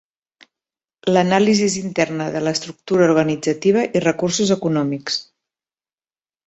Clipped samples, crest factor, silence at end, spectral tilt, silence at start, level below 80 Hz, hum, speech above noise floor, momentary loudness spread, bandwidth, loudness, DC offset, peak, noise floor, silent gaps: under 0.1%; 18 dB; 1.25 s; -5 dB/octave; 1.05 s; -58 dBFS; none; over 72 dB; 8 LU; 8.4 kHz; -18 LUFS; under 0.1%; -2 dBFS; under -90 dBFS; none